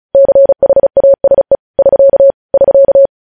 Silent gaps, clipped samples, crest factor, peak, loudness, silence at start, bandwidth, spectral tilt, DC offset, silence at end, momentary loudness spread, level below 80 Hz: 1.59-1.74 s, 2.34-2.49 s; under 0.1%; 6 dB; 0 dBFS; -8 LUFS; 0.15 s; 1.8 kHz; -11 dB/octave; 0.4%; 0.15 s; 4 LU; -42 dBFS